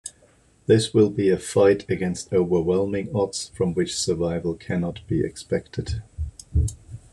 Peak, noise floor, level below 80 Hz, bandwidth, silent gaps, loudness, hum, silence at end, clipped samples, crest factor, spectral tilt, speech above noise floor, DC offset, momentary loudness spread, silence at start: -6 dBFS; -57 dBFS; -38 dBFS; 12.5 kHz; none; -23 LUFS; none; 0.15 s; under 0.1%; 18 dB; -6 dB/octave; 35 dB; under 0.1%; 12 LU; 0.05 s